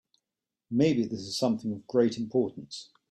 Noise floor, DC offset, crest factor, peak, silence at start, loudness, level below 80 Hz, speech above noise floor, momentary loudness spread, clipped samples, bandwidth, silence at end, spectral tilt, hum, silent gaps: -89 dBFS; under 0.1%; 18 dB; -12 dBFS; 0.7 s; -29 LUFS; -68 dBFS; 61 dB; 14 LU; under 0.1%; 12.5 kHz; 0.3 s; -6 dB/octave; none; none